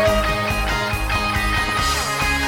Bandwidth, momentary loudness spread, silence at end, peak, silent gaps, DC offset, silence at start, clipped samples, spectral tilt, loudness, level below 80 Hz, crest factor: 18.5 kHz; 2 LU; 0 s; -6 dBFS; none; under 0.1%; 0 s; under 0.1%; -3.5 dB/octave; -20 LUFS; -28 dBFS; 14 dB